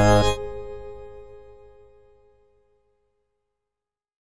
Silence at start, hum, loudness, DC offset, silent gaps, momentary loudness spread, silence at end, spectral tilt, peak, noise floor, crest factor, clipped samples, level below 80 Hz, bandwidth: 0 s; none; -24 LUFS; under 0.1%; none; 27 LU; 2.85 s; -5.5 dB/octave; -6 dBFS; -88 dBFS; 22 dB; under 0.1%; -38 dBFS; 10.5 kHz